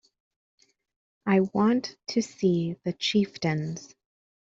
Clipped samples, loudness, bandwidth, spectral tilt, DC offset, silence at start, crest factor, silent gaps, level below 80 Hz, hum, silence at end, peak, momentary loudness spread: under 0.1%; -27 LUFS; 7.8 kHz; -6 dB/octave; under 0.1%; 1.25 s; 18 dB; none; -66 dBFS; none; 0.55 s; -10 dBFS; 8 LU